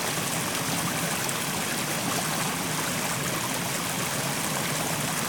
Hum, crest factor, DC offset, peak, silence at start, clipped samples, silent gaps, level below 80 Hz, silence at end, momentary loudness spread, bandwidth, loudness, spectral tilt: none; 18 dB; under 0.1%; -10 dBFS; 0 s; under 0.1%; none; -58 dBFS; 0 s; 1 LU; 19 kHz; -27 LUFS; -2.5 dB/octave